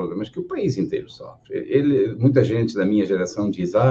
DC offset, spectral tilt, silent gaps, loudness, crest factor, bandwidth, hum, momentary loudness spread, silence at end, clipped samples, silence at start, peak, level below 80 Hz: under 0.1%; -8 dB/octave; none; -21 LUFS; 18 dB; 7.8 kHz; none; 12 LU; 0 s; under 0.1%; 0 s; -2 dBFS; -56 dBFS